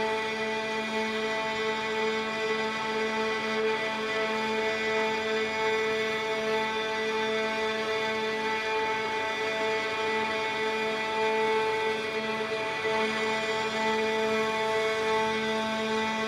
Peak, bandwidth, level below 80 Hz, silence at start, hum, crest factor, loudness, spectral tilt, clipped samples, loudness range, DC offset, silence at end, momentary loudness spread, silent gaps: -16 dBFS; 14 kHz; -64 dBFS; 0 s; none; 14 dB; -28 LUFS; -3 dB/octave; under 0.1%; 1 LU; under 0.1%; 0 s; 3 LU; none